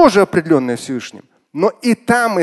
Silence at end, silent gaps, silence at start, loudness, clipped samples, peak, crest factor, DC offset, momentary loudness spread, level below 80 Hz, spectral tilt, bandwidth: 0 s; none; 0 s; -16 LUFS; under 0.1%; 0 dBFS; 14 dB; under 0.1%; 13 LU; -50 dBFS; -5.5 dB/octave; 12.5 kHz